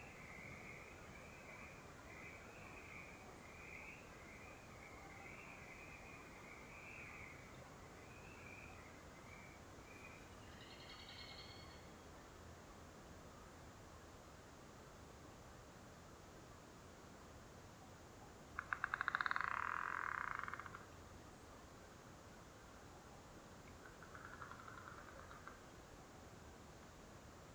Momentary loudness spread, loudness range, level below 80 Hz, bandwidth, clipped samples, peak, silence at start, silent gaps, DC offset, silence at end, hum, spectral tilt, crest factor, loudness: 15 LU; 15 LU; -68 dBFS; over 20 kHz; under 0.1%; -22 dBFS; 0 s; none; under 0.1%; 0 s; none; -4 dB/octave; 32 dB; -53 LUFS